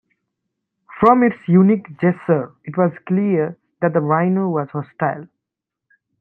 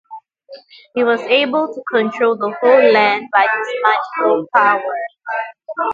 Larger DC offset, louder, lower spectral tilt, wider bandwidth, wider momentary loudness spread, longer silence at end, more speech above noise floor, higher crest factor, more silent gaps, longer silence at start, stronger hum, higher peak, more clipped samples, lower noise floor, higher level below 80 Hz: neither; second, -18 LUFS vs -15 LUFS; first, -11.5 dB/octave vs -5 dB/octave; second, 3.8 kHz vs 7.4 kHz; about the same, 10 LU vs 12 LU; first, 0.95 s vs 0 s; first, 67 dB vs 22 dB; about the same, 18 dB vs 16 dB; neither; first, 0.9 s vs 0.1 s; neither; about the same, -2 dBFS vs 0 dBFS; neither; first, -83 dBFS vs -37 dBFS; first, -60 dBFS vs -70 dBFS